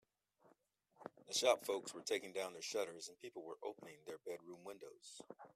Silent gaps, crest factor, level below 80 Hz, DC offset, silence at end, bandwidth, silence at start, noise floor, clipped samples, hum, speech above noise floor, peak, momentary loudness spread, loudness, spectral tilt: none; 26 dB; under -90 dBFS; under 0.1%; 0.05 s; 15.5 kHz; 1 s; -76 dBFS; under 0.1%; none; 32 dB; -18 dBFS; 20 LU; -43 LUFS; -1.5 dB/octave